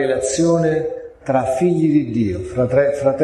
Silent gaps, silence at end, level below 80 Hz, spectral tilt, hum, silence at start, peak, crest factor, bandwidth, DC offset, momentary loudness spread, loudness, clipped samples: none; 0 s; -44 dBFS; -6.5 dB/octave; none; 0 s; -4 dBFS; 14 dB; 12 kHz; under 0.1%; 6 LU; -18 LUFS; under 0.1%